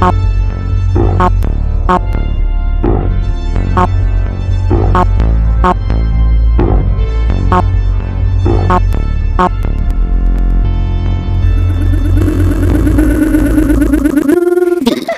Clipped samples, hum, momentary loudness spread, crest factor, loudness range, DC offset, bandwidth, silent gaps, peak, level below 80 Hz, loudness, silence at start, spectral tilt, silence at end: under 0.1%; none; 6 LU; 10 dB; 3 LU; 0.3%; 12.5 kHz; none; 0 dBFS; -12 dBFS; -12 LUFS; 0 s; -8 dB/octave; 0 s